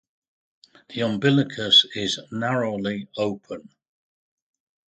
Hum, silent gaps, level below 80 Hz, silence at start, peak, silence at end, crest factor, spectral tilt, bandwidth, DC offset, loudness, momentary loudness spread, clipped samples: none; none; -62 dBFS; 0.9 s; -4 dBFS; 1.25 s; 22 dB; -4.5 dB/octave; 9.2 kHz; under 0.1%; -21 LUFS; 20 LU; under 0.1%